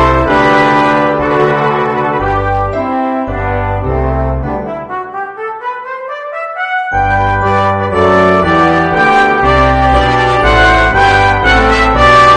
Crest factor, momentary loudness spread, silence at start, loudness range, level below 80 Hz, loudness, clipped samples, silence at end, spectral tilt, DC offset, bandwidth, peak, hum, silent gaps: 10 dB; 12 LU; 0 s; 9 LU; -22 dBFS; -10 LUFS; 0.2%; 0 s; -6 dB/octave; under 0.1%; 10 kHz; 0 dBFS; none; none